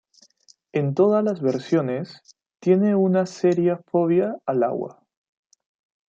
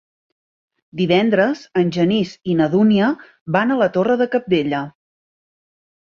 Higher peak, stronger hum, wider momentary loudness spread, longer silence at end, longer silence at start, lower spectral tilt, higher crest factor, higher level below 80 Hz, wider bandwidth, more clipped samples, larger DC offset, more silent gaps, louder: second, -6 dBFS vs -2 dBFS; neither; about the same, 10 LU vs 9 LU; about the same, 1.2 s vs 1.2 s; second, 0.75 s vs 0.95 s; about the same, -8 dB/octave vs -7.5 dB/octave; about the same, 16 dB vs 16 dB; second, -72 dBFS vs -58 dBFS; about the same, 7.6 kHz vs 7 kHz; neither; neither; second, none vs 3.41-3.46 s; second, -22 LUFS vs -18 LUFS